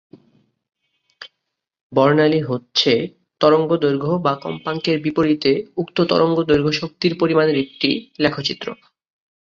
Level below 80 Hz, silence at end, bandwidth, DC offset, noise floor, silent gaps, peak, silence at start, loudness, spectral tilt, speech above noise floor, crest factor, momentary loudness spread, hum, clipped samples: -56 dBFS; 0.7 s; 7.4 kHz; under 0.1%; -78 dBFS; 1.81-1.90 s; -2 dBFS; 1.2 s; -18 LUFS; -6 dB/octave; 60 dB; 18 dB; 8 LU; none; under 0.1%